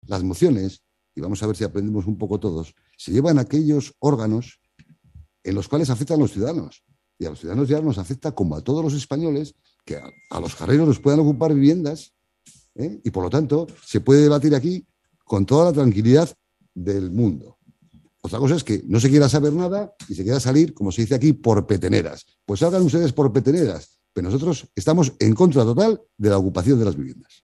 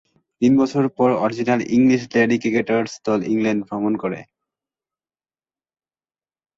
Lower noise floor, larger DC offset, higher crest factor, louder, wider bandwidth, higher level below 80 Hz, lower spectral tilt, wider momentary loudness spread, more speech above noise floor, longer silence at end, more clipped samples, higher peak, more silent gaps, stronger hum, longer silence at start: second, -56 dBFS vs under -90 dBFS; neither; about the same, 18 dB vs 16 dB; about the same, -20 LUFS vs -19 LUFS; first, 12 kHz vs 7.6 kHz; first, -50 dBFS vs -60 dBFS; about the same, -7 dB/octave vs -6.5 dB/octave; first, 15 LU vs 6 LU; second, 37 dB vs over 72 dB; second, 0.3 s vs 2.35 s; neither; about the same, -2 dBFS vs -4 dBFS; neither; neither; second, 0.05 s vs 0.4 s